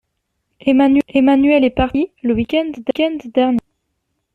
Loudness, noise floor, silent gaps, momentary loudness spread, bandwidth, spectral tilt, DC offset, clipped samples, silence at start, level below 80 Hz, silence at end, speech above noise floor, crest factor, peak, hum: -16 LUFS; -72 dBFS; none; 7 LU; 4.6 kHz; -7.5 dB/octave; under 0.1%; under 0.1%; 0.65 s; -40 dBFS; 0.75 s; 57 dB; 14 dB; -2 dBFS; none